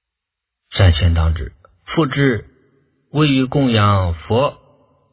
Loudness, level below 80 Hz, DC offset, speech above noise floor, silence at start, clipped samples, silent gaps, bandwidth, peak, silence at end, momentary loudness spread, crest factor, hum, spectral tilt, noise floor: -17 LUFS; -26 dBFS; under 0.1%; 67 dB; 0.7 s; under 0.1%; none; 4 kHz; 0 dBFS; 0.6 s; 11 LU; 18 dB; none; -11 dB/octave; -82 dBFS